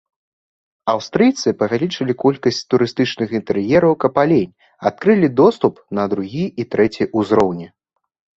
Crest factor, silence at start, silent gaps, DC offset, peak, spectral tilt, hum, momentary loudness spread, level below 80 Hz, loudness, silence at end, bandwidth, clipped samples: 16 dB; 0.85 s; none; under 0.1%; -2 dBFS; -6.5 dB/octave; none; 9 LU; -54 dBFS; -17 LUFS; 0.7 s; 8 kHz; under 0.1%